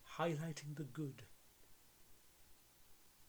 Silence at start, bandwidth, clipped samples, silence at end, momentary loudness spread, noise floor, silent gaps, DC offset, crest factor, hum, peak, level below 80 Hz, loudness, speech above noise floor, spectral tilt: 0 s; over 20 kHz; under 0.1%; 0 s; 24 LU; -65 dBFS; none; under 0.1%; 22 dB; none; -26 dBFS; -76 dBFS; -45 LUFS; 21 dB; -6 dB/octave